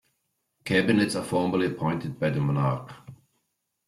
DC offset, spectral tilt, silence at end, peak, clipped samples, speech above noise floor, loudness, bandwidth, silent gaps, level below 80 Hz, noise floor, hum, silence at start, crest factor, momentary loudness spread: under 0.1%; -6.5 dB/octave; 0.75 s; -8 dBFS; under 0.1%; 53 dB; -26 LUFS; 13 kHz; none; -60 dBFS; -78 dBFS; none; 0.65 s; 18 dB; 9 LU